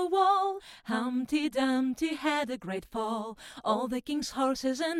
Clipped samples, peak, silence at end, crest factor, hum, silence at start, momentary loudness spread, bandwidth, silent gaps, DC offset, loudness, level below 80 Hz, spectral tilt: under 0.1%; -14 dBFS; 0 s; 16 dB; none; 0 s; 10 LU; 15.5 kHz; none; under 0.1%; -30 LUFS; -62 dBFS; -4 dB/octave